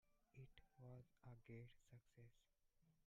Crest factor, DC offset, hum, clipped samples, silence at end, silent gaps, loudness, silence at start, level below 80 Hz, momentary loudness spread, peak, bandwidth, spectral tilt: 16 dB; under 0.1%; none; under 0.1%; 0 s; none; -65 LUFS; 0.05 s; -80 dBFS; 6 LU; -48 dBFS; 7.2 kHz; -7 dB/octave